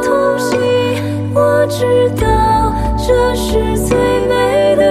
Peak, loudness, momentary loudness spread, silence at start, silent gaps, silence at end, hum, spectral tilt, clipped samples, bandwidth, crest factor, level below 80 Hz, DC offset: 0 dBFS; -13 LUFS; 4 LU; 0 s; none; 0 s; none; -5.5 dB/octave; under 0.1%; 15 kHz; 12 dB; -24 dBFS; under 0.1%